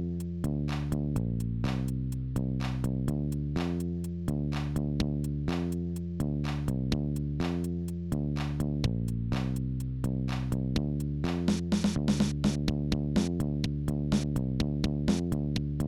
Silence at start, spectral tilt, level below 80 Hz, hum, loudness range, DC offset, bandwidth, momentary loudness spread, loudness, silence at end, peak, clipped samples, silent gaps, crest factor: 0 s; -7 dB/octave; -40 dBFS; none; 3 LU; 0.1%; 14 kHz; 4 LU; -31 LUFS; 0 s; -16 dBFS; under 0.1%; none; 16 dB